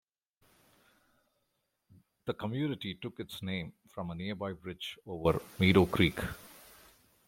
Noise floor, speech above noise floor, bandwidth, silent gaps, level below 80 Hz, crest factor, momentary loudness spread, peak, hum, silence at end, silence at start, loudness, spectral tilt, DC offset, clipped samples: -81 dBFS; 48 dB; 16.5 kHz; none; -58 dBFS; 26 dB; 18 LU; -10 dBFS; none; 0.65 s; 2.25 s; -33 LUFS; -6.5 dB/octave; under 0.1%; under 0.1%